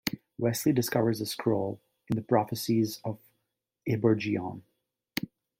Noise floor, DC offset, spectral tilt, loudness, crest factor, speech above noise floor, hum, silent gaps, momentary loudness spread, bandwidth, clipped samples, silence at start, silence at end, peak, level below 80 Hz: -83 dBFS; under 0.1%; -5.5 dB/octave; -30 LUFS; 20 dB; 55 dB; none; none; 13 LU; 16.5 kHz; under 0.1%; 0.05 s; 0.35 s; -10 dBFS; -66 dBFS